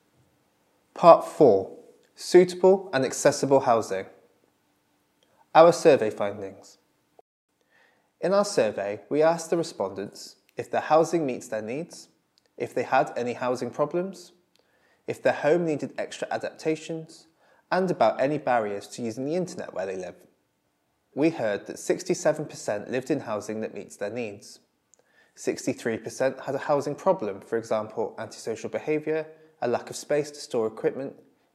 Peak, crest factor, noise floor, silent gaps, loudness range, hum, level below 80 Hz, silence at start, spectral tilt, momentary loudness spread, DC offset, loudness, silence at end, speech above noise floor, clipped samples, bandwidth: -2 dBFS; 26 dB; -73 dBFS; 7.21-7.48 s; 8 LU; none; -82 dBFS; 0.95 s; -5 dB/octave; 17 LU; under 0.1%; -25 LUFS; 0.45 s; 48 dB; under 0.1%; 13.5 kHz